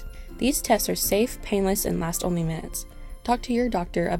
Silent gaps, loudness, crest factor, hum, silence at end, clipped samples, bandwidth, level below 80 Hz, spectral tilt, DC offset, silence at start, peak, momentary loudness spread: none; -25 LUFS; 18 dB; none; 0 s; under 0.1%; 17.5 kHz; -38 dBFS; -4.5 dB/octave; under 0.1%; 0 s; -6 dBFS; 12 LU